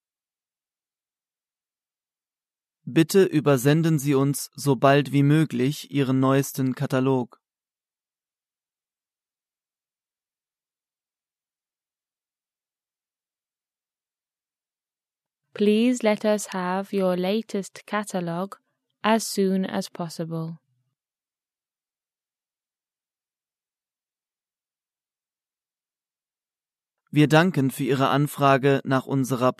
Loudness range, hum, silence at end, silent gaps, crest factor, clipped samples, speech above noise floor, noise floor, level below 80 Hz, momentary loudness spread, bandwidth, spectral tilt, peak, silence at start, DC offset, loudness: 10 LU; none; 0.05 s; none; 22 dB; under 0.1%; over 68 dB; under -90 dBFS; -72 dBFS; 12 LU; 14 kHz; -6 dB/octave; -4 dBFS; 2.85 s; under 0.1%; -23 LUFS